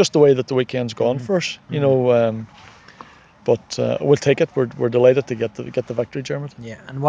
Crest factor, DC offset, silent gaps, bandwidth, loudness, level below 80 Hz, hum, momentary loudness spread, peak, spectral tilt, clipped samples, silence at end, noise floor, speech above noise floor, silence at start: 18 dB; under 0.1%; none; 9.6 kHz; -19 LUFS; -58 dBFS; none; 13 LU; -2 dBFS; -6 dB/octave; under 0.1%; 0 s; -44 dBFS; 26 dB; 0 s